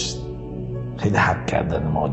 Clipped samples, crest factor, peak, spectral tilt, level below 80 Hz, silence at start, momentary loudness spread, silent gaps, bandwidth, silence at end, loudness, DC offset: under 0.1%; 18 dB; -4 dBFS; -5.5 dB/octave; -36 dBFS; 0 s; 12 LU; none; 8.6 kHz; 0 s; -23 LUFS; under 0.1%